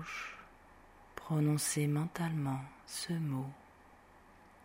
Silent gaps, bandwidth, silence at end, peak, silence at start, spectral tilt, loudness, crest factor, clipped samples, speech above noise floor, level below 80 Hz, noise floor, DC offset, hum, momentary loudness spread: none; 16 kHz; 0.15 s; -22 dBFS; 0 s; -5 dB/octave; -36 LUFS; 16 dB; under 0.1%; 25 dB; -66 dBFS; -60 dBFS; under 0.1%; none; 18 LU